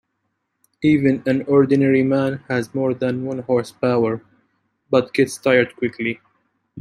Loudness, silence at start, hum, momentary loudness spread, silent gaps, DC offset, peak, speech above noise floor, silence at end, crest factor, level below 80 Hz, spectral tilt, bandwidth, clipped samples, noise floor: -19 LUFS; 0.8 s; none; 8 LU; none; under 0.1%; -2 dBFS; 55 dB; 0 s; 18 dB; -60 dBFS; -7 dB/octave; 12.5 kHz; under 0.1%; -73 dBFS